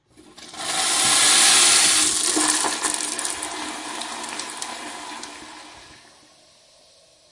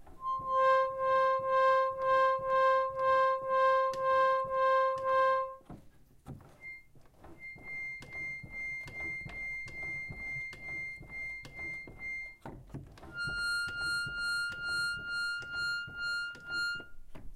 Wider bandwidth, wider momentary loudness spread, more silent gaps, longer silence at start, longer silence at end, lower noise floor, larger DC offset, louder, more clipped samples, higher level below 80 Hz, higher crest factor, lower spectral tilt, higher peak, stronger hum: about the same, 11.5 kHz vs 12 kHz; first, 22 LU vs 19 LU; neither; first, 0.4 s vs 0 s; first, 1.4 s vs 0 s; about the same, -54 dBFS vs -57 dBFS; neither; first, -17 LUFS vs -32 LUFS; neither; about the same, -62 dBFS vs -58 dBFS; about the same, 20 dB vs 16 dB; second, 1 dB/octave vs -3 dB/octave; first, -2 dBFS vs -18 dBFS; neither